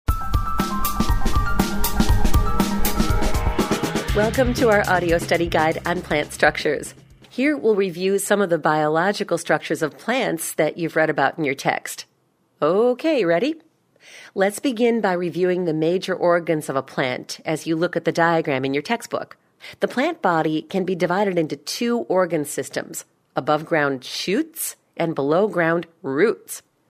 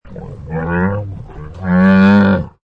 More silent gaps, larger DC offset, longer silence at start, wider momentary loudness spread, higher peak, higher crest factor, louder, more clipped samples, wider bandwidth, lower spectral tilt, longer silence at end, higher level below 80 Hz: neither; neither; about the same, 0.1 s vs 0.05 s; second, 8 LU vs 22 LU; about the same, 0 dBFS vs -2 dBFS; first, 20 dB vs 12 dB; second, -21 LUFS vs -13 LUFS; neither; first, 16 kHz vs 5.4 kHz; second, -5 dB/octave vs -9.5 dB/octave; first, 0.3 s vs 0.15 s; about the same, -32 dBFS vs -36 dBFS